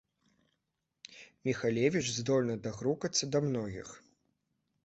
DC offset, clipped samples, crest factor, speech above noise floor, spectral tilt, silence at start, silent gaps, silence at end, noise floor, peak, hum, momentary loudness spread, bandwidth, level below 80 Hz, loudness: under 0.1%; under 0.1%; 20 dB; 52 dB; -4.5 dB/octave; 1.1 s; none; 0.85 s; -84 dBFS; -14 dBFS; none; 20 LU; 8.4 kHz; -66 dBFS; -33 LUFS